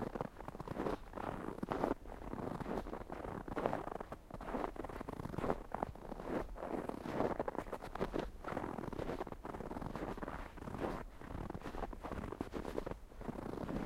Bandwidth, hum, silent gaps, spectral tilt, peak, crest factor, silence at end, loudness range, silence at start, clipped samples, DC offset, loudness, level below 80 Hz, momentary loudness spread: 16 kHz; none; none; -7 dB/octave; -16 dBFS; 28 dB; 0 s; 3 LU; 0 s; under 0.1%; under 0.1%; -44 LUFS; -52 dBFS; 8 LU